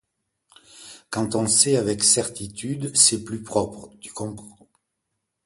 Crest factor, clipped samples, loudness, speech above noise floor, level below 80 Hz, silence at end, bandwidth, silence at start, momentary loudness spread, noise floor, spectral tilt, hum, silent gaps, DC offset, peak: 22 dB; under 0.1%; -20 LUFS; 56 dB; -56 dBFS; 0.95 s; 12 kHz; 0.75 s; 17 LU; -79 dBFS; -2.5 dB/octave; none; none; under 0.1%; -2 dBFS